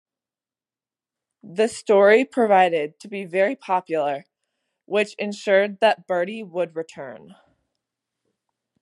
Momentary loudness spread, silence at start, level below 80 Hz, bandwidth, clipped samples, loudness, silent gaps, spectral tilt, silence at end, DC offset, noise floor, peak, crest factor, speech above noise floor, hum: 16 LU; 1.45 s; -80 dBFS; 11.5 kHz; under 0.1%; -21 LUFS; none; -4.5 dB/octave; 1.65 s; under 0.1%; under -90 dBFS; -2 dBFS; 20 dB; over 69 dB; none